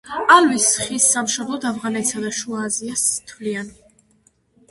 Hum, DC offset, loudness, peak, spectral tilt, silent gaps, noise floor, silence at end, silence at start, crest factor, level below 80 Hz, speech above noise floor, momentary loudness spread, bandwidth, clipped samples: none; under 0.1%; -18 LUFS; 0 dBFS; -1.5 dB/octave; none; -60 dBFS; 1 s; 0.05 s; 20 dB; -60 dBFS; 40 dB; 15 LU; 12 kHz; under 0.1%